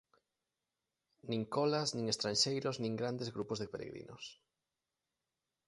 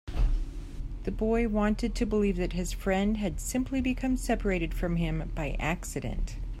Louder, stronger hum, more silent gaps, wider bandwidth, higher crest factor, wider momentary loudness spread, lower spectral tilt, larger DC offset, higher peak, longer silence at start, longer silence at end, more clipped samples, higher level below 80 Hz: second, -36 LUFS vs -30 LUFS; neither; neither; second, 11.5 kHz vs 14.5 kHz; first, 22 dB vs 16 dB; first, 17 LU vs 9 LU; second, -4 dB/octave vs -6 dB/octave; neither; second, -18 dBFS vs -14 dBFS; first, 1.25 s vs 0.05 s; first, 1.35 s vs 0 s; neither; second, -74 dBFS vs -34 dBFS